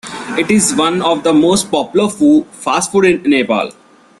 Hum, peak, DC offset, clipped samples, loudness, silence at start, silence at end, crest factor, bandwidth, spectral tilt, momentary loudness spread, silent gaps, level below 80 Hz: none; 0 dBFS; under 0.1%; under 0.1%; -13 LUFS; 0.05 s; 0.5 s; 14 dB; 12.5 kHz; -4 dB/octave; 7 LU; none; -50 dBFS